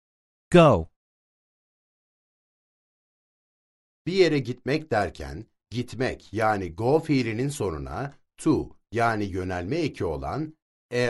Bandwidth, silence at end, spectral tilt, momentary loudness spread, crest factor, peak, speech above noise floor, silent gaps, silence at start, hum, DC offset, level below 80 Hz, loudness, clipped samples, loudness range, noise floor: 11.5 kHz; 0 s; -6.5 dB/octave; 15 LU; 24 dB; -2 dBFS; over 66 dB; 0.96-4.05 s, 10.62-10.89 s; 0.5 s; none; under 0.1%; -48 dBFS; -25 LUFS; under 0.1%; 4 LU; under -90 dBFS